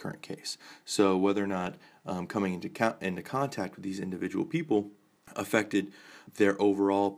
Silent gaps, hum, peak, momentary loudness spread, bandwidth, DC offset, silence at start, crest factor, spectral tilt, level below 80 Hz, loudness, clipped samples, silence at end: none; none; -10 dBFS; 15 LU; 16 kHz; under 0.1%; 0 s; 22 dB; -5.5 dB/octave; -72 dBFS; -30 LUFS; under 0.1%; 0 s